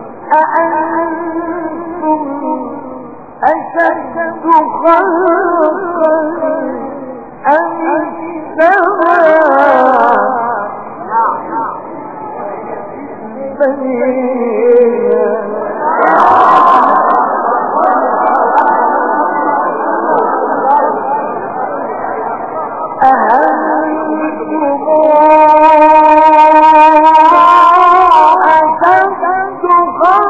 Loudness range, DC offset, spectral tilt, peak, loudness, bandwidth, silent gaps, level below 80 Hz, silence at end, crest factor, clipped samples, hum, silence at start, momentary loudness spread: 11 LU; 1%; -6 dB/octave; 0 dBFS; -10 LUFS; 7.6 kHz; none; -52 dBFS; 0 s; 10 dB; 0.4%; none; 0 s; 15 LU